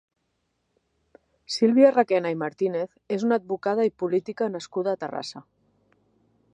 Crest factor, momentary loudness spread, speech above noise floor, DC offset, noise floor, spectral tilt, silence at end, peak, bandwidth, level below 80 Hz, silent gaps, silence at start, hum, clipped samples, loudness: 20 dB; 14 LU; 51 dB; under 0.1%; -75 dBFS; -5.5 dB/octave; 1.15 s; -6 dBFS; 10.5 kHz; -74 dBFS; none; 1.5 s; none; under 0.1%; -24 LUFS